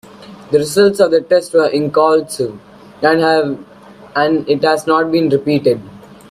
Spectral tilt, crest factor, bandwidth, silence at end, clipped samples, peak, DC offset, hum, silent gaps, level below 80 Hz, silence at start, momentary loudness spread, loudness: -5 dB/octave; 14 dB; 15 kHz; 0.15 s; under 0.1%; 0 dBFS; under 0.1%; none; none; -54 dBFS; 0.2 s; 10 LU; -14 LUFS